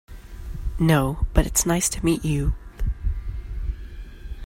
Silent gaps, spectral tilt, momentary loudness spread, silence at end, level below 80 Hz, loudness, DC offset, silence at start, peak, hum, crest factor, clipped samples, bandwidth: none; -5 dB/octave; 20 LU; 0 s; -28 dBFS; -24 LUFS; under 0.1%; 0.1 s; 0 dBFS; none; 22 dB; under 0.1%; 16.5 kHz